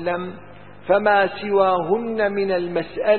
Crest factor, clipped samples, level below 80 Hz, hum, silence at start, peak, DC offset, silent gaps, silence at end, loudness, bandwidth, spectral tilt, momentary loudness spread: 16 dB; under 0.1%; -56 dBFS; none; 0 s; -4 dBFS; 0.7%; none; 0 s; -20 LUFS; 4.4 kHz; -10.5 dB/octave; 13 LU